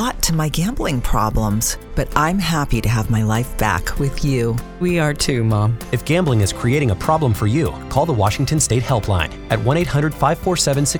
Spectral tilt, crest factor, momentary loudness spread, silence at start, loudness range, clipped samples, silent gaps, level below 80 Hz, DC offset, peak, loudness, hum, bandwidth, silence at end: -5 dB/octave; 18 dB; 4 LU; 0 s; 1 LU; under 0.1%; none; -28 dBFS; under 0.1%; 0 dBFS; -18 LUFS; none; 19.5 kHz; 0 s